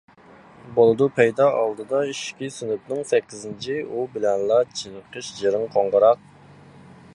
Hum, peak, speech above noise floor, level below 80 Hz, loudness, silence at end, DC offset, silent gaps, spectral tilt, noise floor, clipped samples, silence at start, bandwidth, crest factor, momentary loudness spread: none; -4 dBFS; 27 dB; -64 dBFS; -22 LUFS; 1 s; under 0.1%; none; -5 dB/octave; -49 dBFS; under 0.1%; 0.65 s; 11 kHz; 20 dB; 14 LU